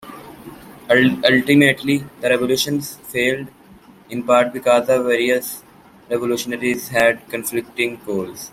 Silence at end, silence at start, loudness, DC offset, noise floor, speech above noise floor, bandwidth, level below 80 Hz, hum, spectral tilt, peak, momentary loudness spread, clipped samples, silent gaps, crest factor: 0.05 s; 0 s; -18 LUFS; under 0.1%; -46 dBFS; 28 dB; 16.5 kHz; -56 dBFS; none; -4.5 dB/octave; 0 dBFS; 18 LU; under 0.1%; none; 18 dB